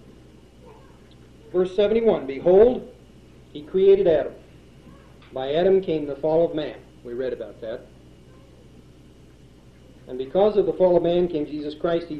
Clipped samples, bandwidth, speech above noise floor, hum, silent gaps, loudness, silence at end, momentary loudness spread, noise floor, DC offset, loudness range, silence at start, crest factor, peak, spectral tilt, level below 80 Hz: under 0.1%; 6 kHz; 29 dB; none; none; -21 LUFS; 0 s; 18 LU; -49 dBFS; 0.2%; 13 LU; 0.65 s; 18 dB; -4 dBFS; -8 dB/octave; -50 dBFS